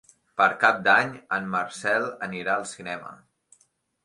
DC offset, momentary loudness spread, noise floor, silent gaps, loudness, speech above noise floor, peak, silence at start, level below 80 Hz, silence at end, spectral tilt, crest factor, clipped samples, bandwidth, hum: under 0.1%; 15 LU; -67 dBFS; none; -24 LUFS; 42 dB; -4 dBFS; 0.35 s; -70 dBFS; 0.9 s; -3.5 dB/octave; 22 dB; under 0.1%; 11.5 kHz; none